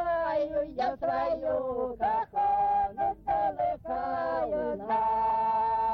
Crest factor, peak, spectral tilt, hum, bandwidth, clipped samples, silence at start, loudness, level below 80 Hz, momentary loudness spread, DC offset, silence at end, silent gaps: 10 dB; -18 dBFS; -7.5 dB/octave; none; 6 kHz; under 0.1%; 0 s; -29 LUFS; -54 dBFS; 5 LU; under 0.1%; 0 s; none